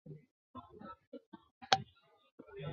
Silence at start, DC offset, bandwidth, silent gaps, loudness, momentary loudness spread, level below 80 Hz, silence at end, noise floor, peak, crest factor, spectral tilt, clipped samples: 0.05 s; under 0.1%; 6 kHz; 0.31-0.54 s, 1.07-1.12 s, 1.26-1.32 s, 1.51-1.61 s, 2.32-2.38 s; -35 LUFS; 23 LU; -72 dBFS; 0 s; -61 dBFS; -6 dBFS; 38 dB; -1.5 dB/octave; under 0.1%